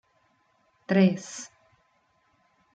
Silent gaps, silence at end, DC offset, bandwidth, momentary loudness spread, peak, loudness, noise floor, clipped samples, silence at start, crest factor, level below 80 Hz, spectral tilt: none; 1.3 s; under 0.1%; 8.8 kHz; 23 LU; -10 dBFS; -25 LUFS; -69 dBFS; under 0.1%; 0.9 s; 20 dB; -74 dBFS; -6.5 dB/octave